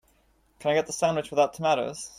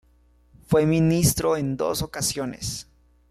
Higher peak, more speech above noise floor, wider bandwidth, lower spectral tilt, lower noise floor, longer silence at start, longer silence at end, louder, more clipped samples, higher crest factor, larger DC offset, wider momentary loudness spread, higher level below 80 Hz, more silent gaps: second, -10 dBFS vs -6 dBFS; about the same, 39 dB vs 36 dB; about the same, 15.5 kHz vs 15 kHz; about the same, -4 dB/octave vs -5 dB/octave; first, -65 dBFS vs -58 dBFS; about the same, 0.6 s vs 0.7 s; second, 0.1 s vs 0.5 s; second, -26 LUFS vs -23 LUFS; neither; about the same, 18 dB vs 18 dB; neither; second, 3 LU vs 12 LU; second, -64 dBFS vs -46 dBFS; neither